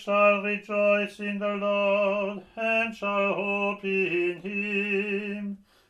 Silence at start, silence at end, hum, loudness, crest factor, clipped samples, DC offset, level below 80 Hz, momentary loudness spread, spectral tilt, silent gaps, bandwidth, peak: 0 s; 0.35 s; none; -26 LUFS; 16 dB; under 0.1%; under 0.1%; -70 dBFS; 8 LU; -6.5 dB/octave; none; 10.5 kHz; -10 dBFS